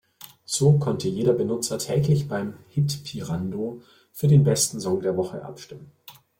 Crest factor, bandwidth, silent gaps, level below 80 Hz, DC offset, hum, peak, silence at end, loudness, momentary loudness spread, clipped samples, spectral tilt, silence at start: 18 dB; 16.5 kHz; none; -56 dBFS; under 0.1%; none; -6 dBFS; 0.3 s; -24 LUFS; 21 LU; under 0.1%; -6 dB/octave; 0.2 s